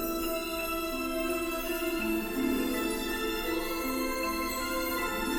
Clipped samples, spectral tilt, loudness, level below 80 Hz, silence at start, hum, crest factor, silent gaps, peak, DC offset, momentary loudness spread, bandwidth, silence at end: under 0.1%; -3 dB/octave; -31 LUFS; -46 dBFS; 0 s; none; 14 dB; none; -18 dBFS; under 0.1%; 2 LU; 17 kHz; 0 s